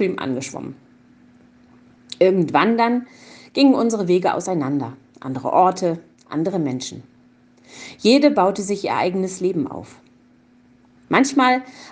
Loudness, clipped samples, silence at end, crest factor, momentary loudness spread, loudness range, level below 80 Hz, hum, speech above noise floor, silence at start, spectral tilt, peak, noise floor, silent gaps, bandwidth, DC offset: -19 LUFS; under 0.1%; 0 s; 20 dB; 17 LU; 3 LU; -66 dBFS; none; 34 dB; 0 s; -5 dB/octave; -2 dBFS; -53 dBFS; none; 9.8 kHz; under 0.1%